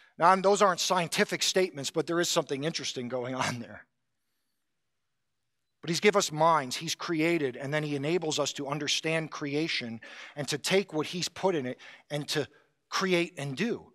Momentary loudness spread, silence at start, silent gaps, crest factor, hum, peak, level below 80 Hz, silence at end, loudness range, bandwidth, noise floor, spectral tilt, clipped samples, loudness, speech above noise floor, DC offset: 11 LU; 0.2 s; none; 22 dB; none; -8 dBFS; -80 dBFS; 0.1 s; 5 LU; 15.5 kHz; -85 dBFS; -3.5 dB/octave; under 0.1%; -29 LUFS; 56 dB; under 0.1%